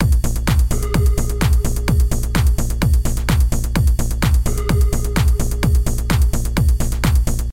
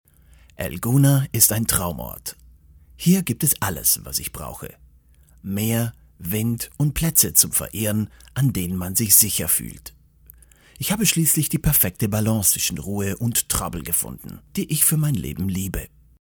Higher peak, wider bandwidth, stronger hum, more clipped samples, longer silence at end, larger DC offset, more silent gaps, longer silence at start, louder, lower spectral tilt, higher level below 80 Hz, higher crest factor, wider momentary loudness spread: about the same, -2 dBFS vs 0 dBFS; second, 16.5 kHz vs over 20 kHz; neither; neither; second, 0 s vs 0.35 s; neither; neither; second, 0 s vs 0.6 s; about the same, -18 LUFS vs -20 LUFS; first, -5.5 dB/octave vs -4 dB/octave; first, -16 dBFS vs -42 dBFS; second, 12 dB vs 22 dB; second, 1 LU vs 16 LU